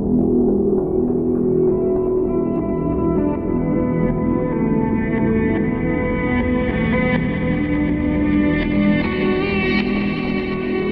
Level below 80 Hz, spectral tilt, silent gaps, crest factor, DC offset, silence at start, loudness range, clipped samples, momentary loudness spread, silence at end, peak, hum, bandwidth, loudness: -32 dBFS; -10 dB/octave; none; 14 dB; under 0.1%; 0 s; 1 LU; under 0.1%; 3 LU; 0 s; -4 dBFS; none; 5.6 kHz; -19 LUFS